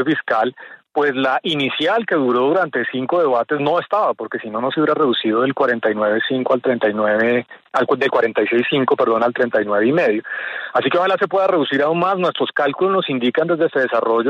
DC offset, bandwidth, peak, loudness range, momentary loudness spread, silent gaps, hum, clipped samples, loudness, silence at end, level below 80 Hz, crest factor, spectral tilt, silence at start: under 0.1%; 7.8 kHz; -4 dBFS; 1 LU; 4 LU; none; none; under 0.1%; -18 LUFS; 0 s; -68 dBFS; 14 dB; -6.5 dB/octave; 0 s